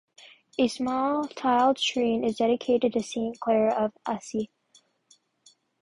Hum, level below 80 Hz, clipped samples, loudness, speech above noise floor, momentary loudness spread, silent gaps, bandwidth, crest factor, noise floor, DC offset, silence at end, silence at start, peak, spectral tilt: none; -66 dBFS; under 0.1%; -26 LUFS; 38 dB; 10 LU; none; 11.5 kHz; 16 dB; -64 dBFS; under 0.1%; 1.35 s; 0.6 s; -10 dBFS; -4.5 dB/octave